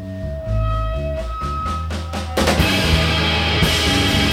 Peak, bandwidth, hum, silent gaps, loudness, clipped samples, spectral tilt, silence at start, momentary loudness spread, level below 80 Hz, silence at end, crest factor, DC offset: -2 dBFS; 16.5 kHz; none; none; -18 LUFS; under 0.1%; -4.5 dB/octave; 0 s; 10 LU; -26 dBFS; 0 s; 16 dB; under 0.1%